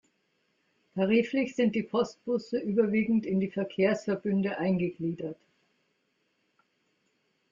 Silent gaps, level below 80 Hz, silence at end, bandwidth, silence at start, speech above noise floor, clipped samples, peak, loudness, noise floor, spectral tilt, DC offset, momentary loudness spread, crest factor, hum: none; -70 dBFS; 2.15 s; 7.4 kHz; 0.95 s; 47 dB; under 0.1%; -12 dBFS; -29 LUFS; -75 dBFS; -7.5 dB/octave; under 0.1%; 8 LU; 18 dB; none